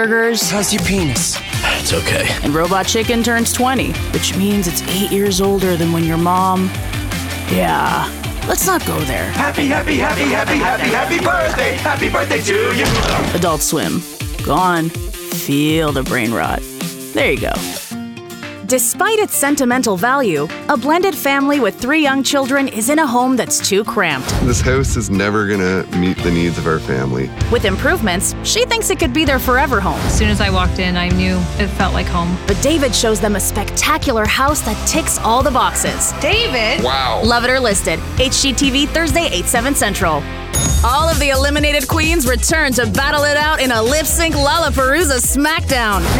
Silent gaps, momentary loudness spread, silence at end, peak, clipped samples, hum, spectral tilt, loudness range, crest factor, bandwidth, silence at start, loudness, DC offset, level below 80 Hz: none; 5 LU; 0 s; -2 dBFS; under 0.1%; none; -3.5 dB/octave; 3 LU; 12 dB; 19 kHz; 0 s; -15 LUFS; under 0.1%; -26 dBFS